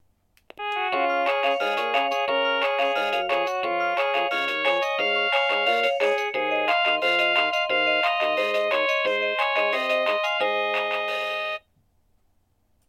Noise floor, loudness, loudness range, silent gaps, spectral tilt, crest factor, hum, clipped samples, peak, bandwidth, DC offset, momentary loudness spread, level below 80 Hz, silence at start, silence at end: -66 dBFS; -23 LUFS; 3 LU; none; -2 dB/octave; 16 dB; none; under 0.1%; -8 dBFS; 14 kHz; under 0.1%; 5 LU; -68 dBFS; 0.6 s; 1.3 s